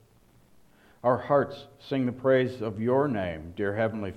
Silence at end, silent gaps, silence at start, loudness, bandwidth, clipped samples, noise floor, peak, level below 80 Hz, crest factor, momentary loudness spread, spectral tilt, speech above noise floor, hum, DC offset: 0 s; none; 1.05 s; -27 LUFS; 10.5 kHz; under 0.1%; -60 dBFS; -10 dBFS; -60 dBFS; 18 dB; 9 LU; -8.5 dB/octave; 33 dB; none; under 0.1%